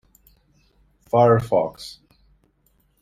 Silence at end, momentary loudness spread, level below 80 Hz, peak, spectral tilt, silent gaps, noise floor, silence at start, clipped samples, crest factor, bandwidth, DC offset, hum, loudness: 1.1 s; 22 LU; -54 dBFS; -4 dBFS; -7.5 dB/octave; none; -64 dBFS; 1.15 s; under 0.1%; 20 dB; 15 kHz; under 0.1%; none; -19 LUFS